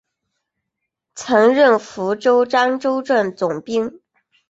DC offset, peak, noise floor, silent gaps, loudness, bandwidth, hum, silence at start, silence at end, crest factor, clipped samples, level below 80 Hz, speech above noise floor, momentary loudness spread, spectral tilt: under 0.1%; -2 dBFS; -79 dBFS; none; -17 LUFS; 8 kHz; none; 1.15 s; 0.6 s; 16 dB; under 0.1%; -64 dBFS; 63 dB; 10 LU; -4.5 dB/octave